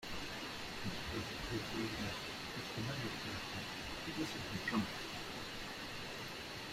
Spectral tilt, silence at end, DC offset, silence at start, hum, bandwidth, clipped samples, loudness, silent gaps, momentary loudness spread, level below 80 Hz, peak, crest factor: -4 dB/octave; 0 s; under 0.1%; 0 s; none; 16 kHz; under 0.1%; -42 LUFS; none; 5 LU; -58 dBFS; -24 dBFS; 18 dB